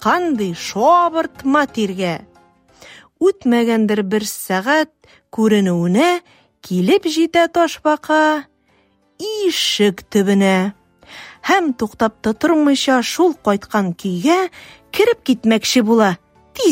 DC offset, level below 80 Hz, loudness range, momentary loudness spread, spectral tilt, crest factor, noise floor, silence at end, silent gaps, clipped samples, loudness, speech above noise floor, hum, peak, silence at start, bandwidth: under 0.1%; -56 dBFS; 2 LU; 9 LU; -4.5 dB/octave; 16 dB; -58 dBFS; 0 s; none; under 0.1%; -16 LUFS; 42 dB; none; -2 dBFS; 0 s; 16 kHz